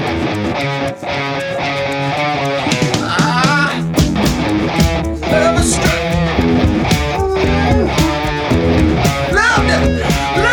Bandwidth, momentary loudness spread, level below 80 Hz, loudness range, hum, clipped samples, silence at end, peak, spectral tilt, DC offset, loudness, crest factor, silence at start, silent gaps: over 20 kHz; 5 LU; -24 dBFS; 2 LU; none; under 0.1%; 0 s; -2 dBFS; -5 dB/octave; under 0.1%; -14 LUFS; 12 dB; 0 s; none